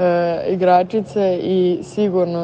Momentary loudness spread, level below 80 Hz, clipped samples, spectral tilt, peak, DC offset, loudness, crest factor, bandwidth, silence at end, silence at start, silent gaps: 5 LU; -56 dBFS; under 0.1%; -7.5 dB/octave; -2 dBFS; under 0.1%; -17 LUFS; 14 dB; 8.8 kHz; 0 s; 0 s; none